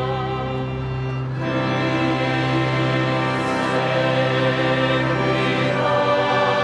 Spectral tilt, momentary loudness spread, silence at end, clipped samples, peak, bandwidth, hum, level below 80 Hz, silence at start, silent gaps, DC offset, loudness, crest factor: -6.5 dB/octave; 7 LU; 0 s; under 0.1%; -6 dBFS; 10 kHz; none; -44 dBFS; 0 s; none; under 0.1%; -20 LUFS; 14 dB